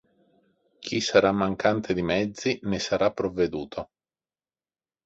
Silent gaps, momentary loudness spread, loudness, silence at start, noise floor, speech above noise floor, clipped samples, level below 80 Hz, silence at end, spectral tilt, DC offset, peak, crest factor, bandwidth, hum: none; 15 LU; -25 LUFS; 0.8 s; under -90 dBFS; over 65 dB; under 0.1%; -54 dBFS; 1.2 s; -5 dB/octave; under 0.1%; -4 dBFS; 24 dB; 8 kHz; none